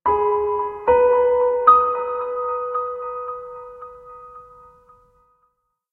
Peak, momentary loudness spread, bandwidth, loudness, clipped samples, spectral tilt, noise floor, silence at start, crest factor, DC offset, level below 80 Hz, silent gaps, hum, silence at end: -2 dBFS; 25 LU; 4 kHz; -19 LUFS; under 0.1%; -8 dB/octave; -68 dBFS; 0.05 s; 20 dB; under 0.1%; -52 dBFS; none; none; 1.5 s